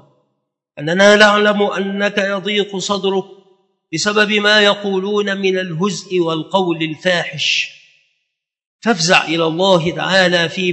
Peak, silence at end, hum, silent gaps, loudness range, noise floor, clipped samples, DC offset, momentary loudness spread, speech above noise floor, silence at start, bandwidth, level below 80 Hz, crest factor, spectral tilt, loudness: 0 dBFS; 0 s; none; 8.67-8.79 s; 4 LU; -74 dBFS; under 0.1%; under 0.1%; 9 LU; 59 dB; 0.75 s; 8.8 kHz; -62 dBFS; 16 dB; -3.5 dB/octave; -15 LUFS